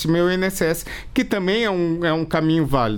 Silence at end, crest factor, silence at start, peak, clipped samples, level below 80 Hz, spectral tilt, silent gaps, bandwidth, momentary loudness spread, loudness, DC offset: 0 s; 14 dB; 0 s; -6 dBFS; under 0.1%; -38 dBFS; -5.5 dB/octave; none; 19 kHz; 4 LU; -20 LUFS; under 0.1%